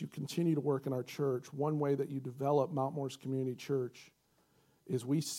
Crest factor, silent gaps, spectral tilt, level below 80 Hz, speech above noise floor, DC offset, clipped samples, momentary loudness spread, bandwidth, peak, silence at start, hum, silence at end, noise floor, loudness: 16 dB; none; -6.5 dB/octave; -84 dBFS; 37 dB; under 0.1%; under 0.1%; 7 LU; 16.5 kHz; -20 dBFS; 0 s; none; 0 s; -72 dBFS; -36 LUFS